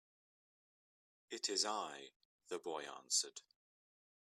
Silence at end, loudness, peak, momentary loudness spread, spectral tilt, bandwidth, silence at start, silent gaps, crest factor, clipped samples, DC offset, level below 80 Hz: 0.8 s; -41 LUFS; -22 dBFS; 17 LU; 0.5 dB/octave; 14 kHz; 1.3 s; 2.16-2.39 s; 24 dB; under 0.1%; under 0.1%; under -90 dBFS